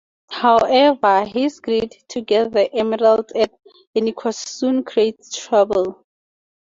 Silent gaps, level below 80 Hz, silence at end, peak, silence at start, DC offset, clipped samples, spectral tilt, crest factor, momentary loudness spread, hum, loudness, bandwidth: 3.87-3.93 s; -58 dBFS; 0.8 s; -2 dBFS; 0.3 s; under 0.1%; under 0.1%; -4 dB/octave; 16 dB; 11 LU; none; -18 LUFS; 7.6 kHz